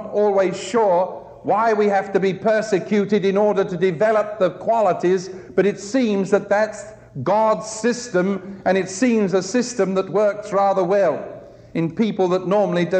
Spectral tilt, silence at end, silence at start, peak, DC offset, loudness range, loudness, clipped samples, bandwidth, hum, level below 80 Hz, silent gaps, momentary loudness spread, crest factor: -5.5 dB/octave; 0 s; 0 s; -4 dBFS; under 0.1%; 2 LU; -20 LUFS; under 0.1%; 9.2 kHz; none; -60 dBFS; none; 7 LU; 14 dB